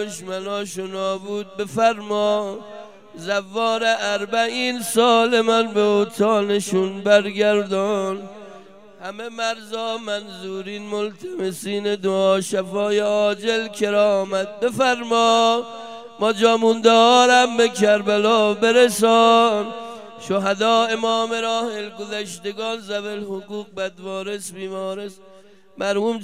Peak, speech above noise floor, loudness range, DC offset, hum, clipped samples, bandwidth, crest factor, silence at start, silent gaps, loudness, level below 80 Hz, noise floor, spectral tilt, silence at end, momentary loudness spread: -2 dBFS; 29 dB; 12 LU; 0.3%; none; under 0.1%; 16 kHz; 18 dB; 0 s; none; -19 LUFS; -74 dBFS; -49 dBFS; -3.5 dB/octave; 0 s; 15 LU